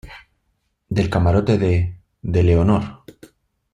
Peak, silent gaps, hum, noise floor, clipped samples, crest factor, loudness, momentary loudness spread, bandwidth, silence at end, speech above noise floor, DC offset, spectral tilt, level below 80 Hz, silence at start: -4 dBFS; none; none; -69 dBFS; under 0.1%; 16 dB; -19 LUFS; 11 LU; 8.6 kHz; 0.8 s; 53 dB; under 0.1%; -8.5 dB/octave; -38 dBFS; 0.05 s